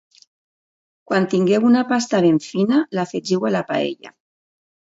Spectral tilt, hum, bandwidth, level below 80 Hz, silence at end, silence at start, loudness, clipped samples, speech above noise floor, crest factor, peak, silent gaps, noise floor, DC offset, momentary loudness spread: -6 dB/octave; none; 8 kHz; -68 dBFS; 0.85 s; 1.1 s; -19 LUFS; under 0.1%; over 72 dB; 16 dB; -4 dBFS; none; under -90 dBFS; under 0.1%; 8 LU